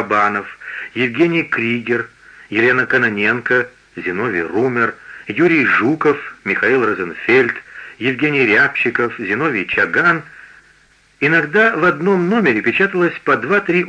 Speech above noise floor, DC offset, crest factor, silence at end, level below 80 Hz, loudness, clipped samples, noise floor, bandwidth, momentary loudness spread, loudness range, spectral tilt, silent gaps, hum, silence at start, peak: 36 dB; under 0.1%; 16 dB; 0 s; -58 dBFS; -15 LUFS; under 0.1%; -52 dBFS; 9 kHz; 9 LU; 2 LU; -6.5 dB/octave; none; none; 0 s; -2 dBFS